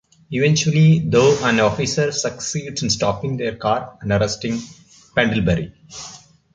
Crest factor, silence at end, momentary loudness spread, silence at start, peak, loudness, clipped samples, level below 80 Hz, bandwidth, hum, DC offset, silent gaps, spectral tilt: 18 dB; 0.35 s; 14 LU; 0.3 s; -2 dBFS; -19 LUFS; under 0.1%; -44 dBFS; 9.2 kHz; none; under 0.1%; none; -5 dB/octave